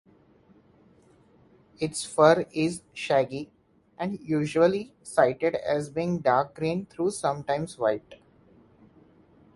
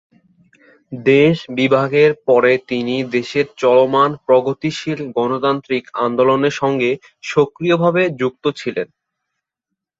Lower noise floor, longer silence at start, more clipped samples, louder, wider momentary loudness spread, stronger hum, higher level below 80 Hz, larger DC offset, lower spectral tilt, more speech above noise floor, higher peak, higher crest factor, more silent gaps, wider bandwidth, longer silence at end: second, -59 dBFS vs -80 dBFS; first, 1.8 s vs 0.9 s; neither; second, -26 LUFS vs -16 LUFS; first, 12 LU vs 9 LU; neither; about the same, -64 dBFS vs -60 dBFS; neither; about the same, -5.5 dB/octave vs -6.5 dB/octave; second, 33 dB vs 65 dB; about the same, -4 dBFS vs -2 dBFS; first, 24 dB vs 16 dB; neither; first, 11.5 kHz vs 7.8 kHz; first, 1.4 s vs 1.15 s